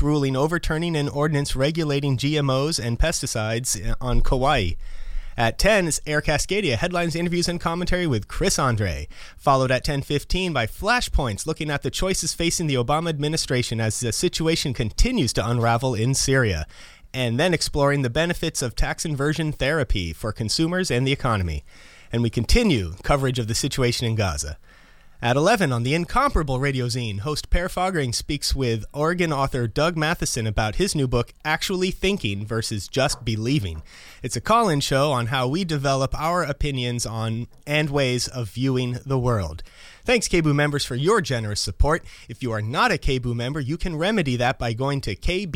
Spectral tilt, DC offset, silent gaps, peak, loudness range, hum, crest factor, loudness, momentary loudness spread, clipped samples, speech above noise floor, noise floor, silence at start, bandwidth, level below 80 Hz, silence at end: -4.5 dB/octave; under 0.1%; none; -6 dBFS; 2 LU; none; 18 dB; -23 LUFS; 6 LU; under 0.1%; 26 dB; -48 dBFS; 0 s; 16.5 kHz; -32 dBFS; 0 s